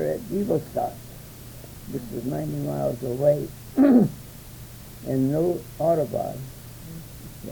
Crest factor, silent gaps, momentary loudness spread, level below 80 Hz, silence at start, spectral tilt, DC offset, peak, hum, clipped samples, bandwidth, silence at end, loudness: 18 dB; none; 21 LU; -50 dBFS; 0 s; -8 dB/octave; under 0.1%; -6 dBFS; none; under 0.1%; over 20 kHz; 0 s; -24 LUFS